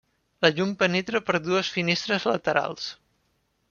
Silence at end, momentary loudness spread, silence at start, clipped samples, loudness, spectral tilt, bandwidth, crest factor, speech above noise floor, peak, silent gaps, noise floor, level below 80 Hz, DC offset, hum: 0.75 s; 5 LU; 0.4 s; under 0.1%; -25 LUFS; -4.5 dB/octave; 7.2 kHz; 24 dB; 46 dB; -4 dBFS; none; -71 dBFS; -66 dBFS; under 0.1%; none